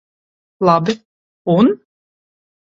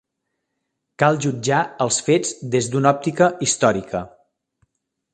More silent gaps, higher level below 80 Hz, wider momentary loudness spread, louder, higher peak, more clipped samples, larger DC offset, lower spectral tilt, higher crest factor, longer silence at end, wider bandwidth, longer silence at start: first, 1.05-1.45 s vs none; about the same, -58 dBFS vs -56 dBFS; first, 13 LU vs 7 LU; first, -15 LUFS vs -19 LUFS; about the same, 0 dBFS vs 0 dBFS; neither; neither; first, -7.5 dB/octave vs -4.5 dB/octave; about the same, 18 dB vs 20 dB; about the same, 0.95 s vs 1.05 s; second, 7.6 kHz vs 10 kHz; second, 0.6 s vs 1 s